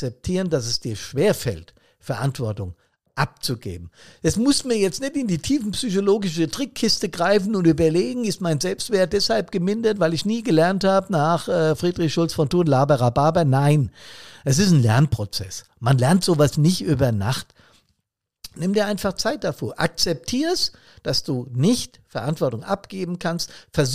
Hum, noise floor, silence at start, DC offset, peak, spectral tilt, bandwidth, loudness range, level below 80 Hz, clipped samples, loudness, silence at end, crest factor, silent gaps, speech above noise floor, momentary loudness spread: none; -78 dBFS; 0 s; 0.6%; -6 dBFS; -5.5 dB/octave; 15.5 kHz; 6 LU; -48 dBFS; under 0.1%; -21 LUFS; 0 s; 16 dB; none; 57 dB; 11 LU